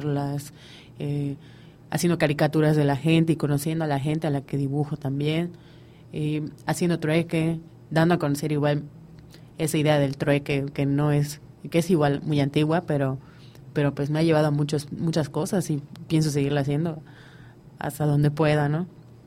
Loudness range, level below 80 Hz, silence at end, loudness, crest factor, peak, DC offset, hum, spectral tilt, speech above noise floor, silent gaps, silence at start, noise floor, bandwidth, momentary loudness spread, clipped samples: 3 LU; -56 dBFS; 0.15 s; -25 LUFS; 18 dB; -6 dBFS; under 0.1%; none; -6.5 dB/octave; 23 dB; none; 0 s; -47 dBFS; 16 kHz; 11 LU; under 0.1%